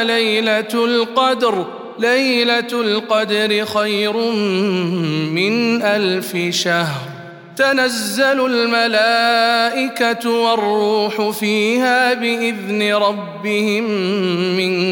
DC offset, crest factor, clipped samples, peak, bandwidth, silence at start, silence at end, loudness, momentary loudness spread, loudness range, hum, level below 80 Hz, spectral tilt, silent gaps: under 0.1%; 14 dB; under 0.1%; -2 dBFS; 17.5 kHz; 0 s; 0 s; -16 LUFS; 5 LU; 2 LU; none; -70 dBFS; -4 dB/octave; none